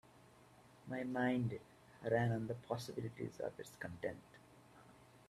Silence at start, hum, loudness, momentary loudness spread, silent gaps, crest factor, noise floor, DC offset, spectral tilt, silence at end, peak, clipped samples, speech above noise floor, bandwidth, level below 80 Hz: 0.15 s; none; -42 LUFS; 26 LU; none; 20 dB; -65 dBFS; under 0.1%; -7 dB/octave; 0.05 s; -22 dBFS; under 0.1%; 24 dB; 14 kHz; -74 dBFS